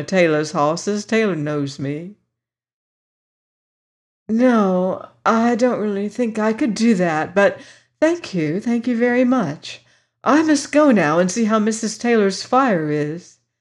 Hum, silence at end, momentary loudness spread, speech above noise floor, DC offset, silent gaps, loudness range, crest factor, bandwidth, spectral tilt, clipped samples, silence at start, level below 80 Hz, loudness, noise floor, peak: none; 0.4 s; 10 LU; 63 dB; under 0.1%; 2.73-4.26 s; 7 LU; 16 dB; 11 kHz; -5.5 dB/octave; under 0.1%; 0 s; -66 dBFS; -18 LUFS; -81 dBFS; -4 dBFS